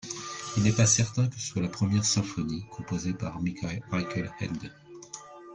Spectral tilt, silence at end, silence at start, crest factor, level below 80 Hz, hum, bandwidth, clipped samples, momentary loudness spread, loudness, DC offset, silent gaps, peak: -4.5 dB/octave; 0 s; 0.05 s; 20 dB; -56 dBFS; none; 10 kHz; under 0.1%; 20 LU; -29 LUFS; under 0.1%; none; -10 dBFS